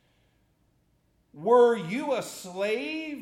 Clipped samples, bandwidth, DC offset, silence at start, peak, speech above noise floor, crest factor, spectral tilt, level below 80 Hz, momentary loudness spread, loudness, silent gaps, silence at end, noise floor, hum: under 0.1%; 14.5 kHz; under 0.1%; 1.35 s; -10 dBFS; 43 dB; 18 dB; -4.5 dB/octave; -74 dBFS; 13 LU; -26 LUFS; none; 0 s; -68 dBFS; none